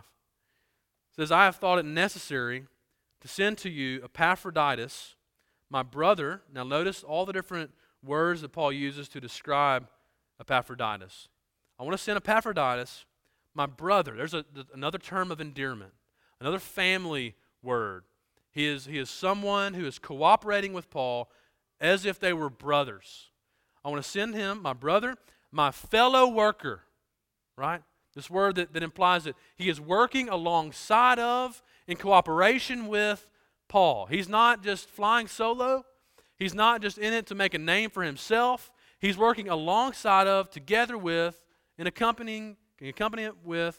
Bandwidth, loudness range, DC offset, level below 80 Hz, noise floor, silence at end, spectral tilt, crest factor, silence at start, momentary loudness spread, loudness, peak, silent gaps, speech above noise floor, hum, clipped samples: 17 kHz; 6 LU; under 0.1%; -64 dBFS; -82 dBFS; 0.05 s; -4 dB/octave; 24 dB; 1.2 s; 14 LU; -27 LUFS; -4 dBFS; none; 55 dB; none; under 0.1%